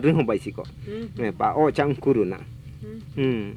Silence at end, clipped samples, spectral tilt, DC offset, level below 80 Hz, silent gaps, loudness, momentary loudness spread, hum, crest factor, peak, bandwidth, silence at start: 0 s; under 0.1%; -8.5 dB/octave; under 0.1%; -48 dBFS; none; -24 LUFS; 18 LU; none; 18 dB; -6 dBFS; 11.5 kHz; 0 s